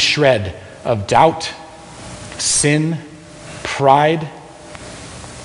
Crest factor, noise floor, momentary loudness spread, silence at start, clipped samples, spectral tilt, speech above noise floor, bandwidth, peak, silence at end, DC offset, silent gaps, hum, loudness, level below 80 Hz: 18 dB; -35 dBFS; 22 LU; 0 s; under 0.1%; -3.5 dB/octave; 21 dB; 11 kHz; 0 dBFS; 0 s; under 0.1%; none; none; -16 LUFS; -46 dBFS